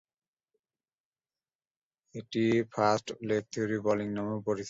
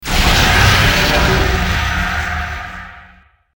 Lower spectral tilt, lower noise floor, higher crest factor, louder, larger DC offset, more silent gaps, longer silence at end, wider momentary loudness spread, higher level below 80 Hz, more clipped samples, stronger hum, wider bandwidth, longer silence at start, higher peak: first, -6 dB/octave vs -3.5 dB/octave; first, under -90 dBFS vs -47 dBFS; first, 20 dB vs 14 dB; second, -31 LUFS vs -13 LUFS; neither; neither; second, 0 s vs 0.5 s; second, 8 LU vs 15 LU; second, -68 dBFS vs -20 dBFS; neither; neither; second, 8 kHz vs over 20 kHz; first, 2.15 s vs 0 s; second, -12 dBFS vs 0 dBFS